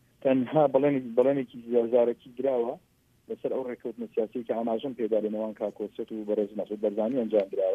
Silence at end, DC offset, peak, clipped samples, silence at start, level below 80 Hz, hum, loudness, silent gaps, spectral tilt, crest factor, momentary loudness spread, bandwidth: 0 s; under 0.1%; -10 dBFS; under 0.1%; 0.25 s; -74 dBFS; none; -28 LUFS; none; -9 dB/octave; 18 dB; 12 LU; 4.3 kHz